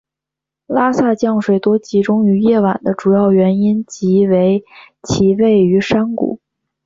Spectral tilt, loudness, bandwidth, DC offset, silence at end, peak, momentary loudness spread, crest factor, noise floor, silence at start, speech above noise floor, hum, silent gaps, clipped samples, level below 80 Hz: -7 dB/octave; -14 LUFS; 7.6 kHz; under 0.1%; 0.5 s; -2 dBFS; 9 LU; 12 dB; -84 dBFS; 0.7 s; 71 dB; none; none; under 0.1%; -48 dBFS